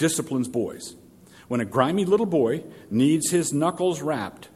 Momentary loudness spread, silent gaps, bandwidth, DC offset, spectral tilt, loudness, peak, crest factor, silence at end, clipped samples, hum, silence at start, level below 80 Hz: 10 LU; none; 16 kHz; under 0.1%; -5 dB/octave; -24 LUFS; -4 dBFS; 20 dB; 0.1 s; under 0.1%; none; 0 s; -64 dBFS